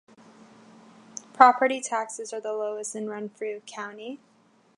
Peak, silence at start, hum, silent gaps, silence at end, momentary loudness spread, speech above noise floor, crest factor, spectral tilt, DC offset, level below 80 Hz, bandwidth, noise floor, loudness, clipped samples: -2 dBFS; 1.15 s; none; none; 0.6 s; 24 LU; 27 dB; 26 dB; -2.5 dB/octave; under 0.1%; -84 dBFS; 11.5 kHz; -52 dBFS; -25 LUFS; under 0.1%